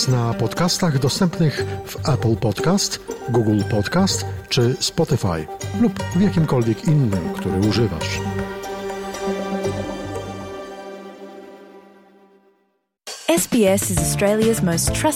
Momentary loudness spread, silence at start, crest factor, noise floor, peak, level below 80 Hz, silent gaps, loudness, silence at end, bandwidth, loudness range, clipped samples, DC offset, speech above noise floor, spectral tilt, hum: 13 LU; 0 s; 16 dB; -67 dBFS; -4 dBFS; -42 dBFS; none; -20 LUFS; 0 s; 16.5 kHz; 9 LU; under 0.1%; under 0.1%; 48 dB; -5 dB/octave; none